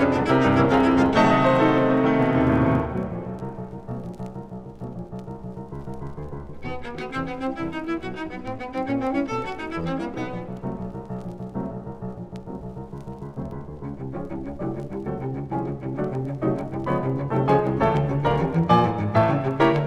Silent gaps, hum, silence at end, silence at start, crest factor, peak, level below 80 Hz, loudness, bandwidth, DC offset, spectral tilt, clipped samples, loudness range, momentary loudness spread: none; none; 0 s; 0 s; 18 dB; -6 dBFS; -44 dBFS; -24 LUFS; 10 kHz; under 0.1%; -8 dB/octave; under 0.1%; 14 LU; 18 LU